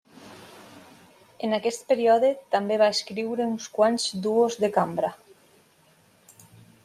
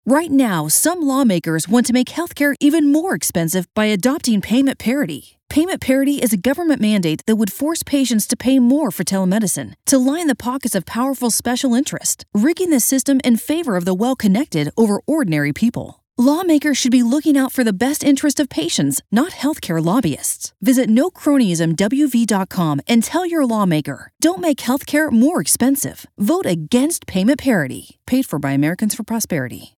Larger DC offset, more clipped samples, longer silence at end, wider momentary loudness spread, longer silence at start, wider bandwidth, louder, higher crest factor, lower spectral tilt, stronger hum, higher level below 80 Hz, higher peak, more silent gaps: neither; neither; first, 1.7 s vs 0.1 s; first, 10 LU vs 6 LU; first, 0.2 s vs 0.05 s; second, 14.5 kHz vs 18 kHz; second, -24 LUFS vs -17 LUFS; about the same, 18 dB vs 14 dB; about the same, -4 dB/octave vs -4.5 dB/octave; neither; second, -74 dBFS vs -52 dBFS; second, -8 dBFS vs -2 dBFS; neither